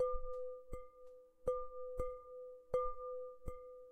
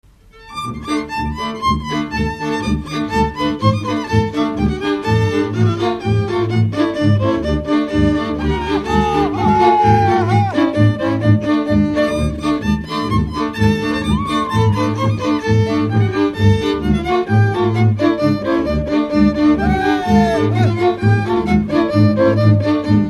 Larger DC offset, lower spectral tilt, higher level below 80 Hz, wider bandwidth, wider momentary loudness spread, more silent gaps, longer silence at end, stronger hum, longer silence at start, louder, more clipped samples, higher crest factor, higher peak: neither; about the same, -7.5 dB/octave vs -7.5 dB/octave; second, -52 dBFS vs -32 dBFS; second, 10 kHz vs 11.5 kHz; first, 14 LU vs 6 LU; neither; about the same, 0 s vs 0 s; neither; second, 0 s vs 0.4 s; second, -45 LUFS vs -16 LUFS; neither; about the same, 18 dB vs 16 dB; second, -26 dBFS vs 0 dBFS